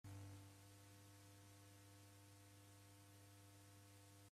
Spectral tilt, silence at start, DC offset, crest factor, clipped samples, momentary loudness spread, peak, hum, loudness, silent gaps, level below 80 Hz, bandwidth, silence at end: -4.5 dB/octave; 0.05 s; under 0.1%; 16 dB; under 0.1%; 5 LU; -48 dBFS; none; -65 LUFS; none; -86 dBFS; 15.5 kHz; 0.05 s